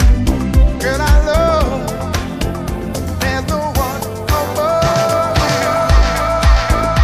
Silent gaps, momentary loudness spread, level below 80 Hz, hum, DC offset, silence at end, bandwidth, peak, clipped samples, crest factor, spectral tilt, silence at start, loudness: none; 8 LU; -16 dBFS; none; under 0.1%; 0 s; 15.5 kHz; 0 dBFS; under 0.1%; 12 dB; -5.5 dB/octave; 0 s; -15 LUFS